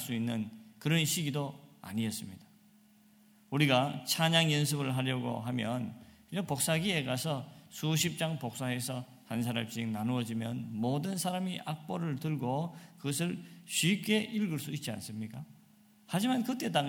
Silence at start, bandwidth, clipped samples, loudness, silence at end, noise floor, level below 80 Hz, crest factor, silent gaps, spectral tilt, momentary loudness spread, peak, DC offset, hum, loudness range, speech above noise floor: 0 s; 17.5 kHz; under 0.1%; -33 LUFS; 0 s; -63 dBFS; -72 dBFS; 22 dB; none; -4.5 dB/octave; 13 LU; -12 dBFS; under 0.1%; none; 4 LU; 30 dB